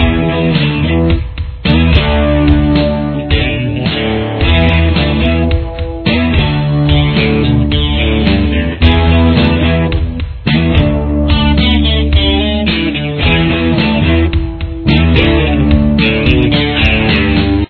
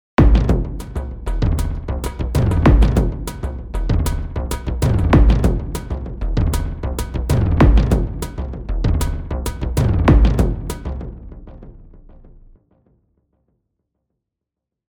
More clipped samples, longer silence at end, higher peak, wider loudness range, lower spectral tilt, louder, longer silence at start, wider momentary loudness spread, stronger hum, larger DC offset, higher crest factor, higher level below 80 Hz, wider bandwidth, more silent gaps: first, 0.2% vs under 0.1%; second, 0.05 s vs 2.95 s; about the same, 0 dBFS vs 0 dBFS; about the same, 1 LU vs 3 LU; first, -9 dB/octave vs -7 dB/octave; first, -11 LUFS vs -19 LUFS; second, 0 s vs 0.2 s; second, 5 LU vs 14 LU; neither; neither; second, 10 dB vs 16 dB; about the same, -16 dBFS vs -20 dBFS; second, 5.4 kHz vs 18.5 kHz; neither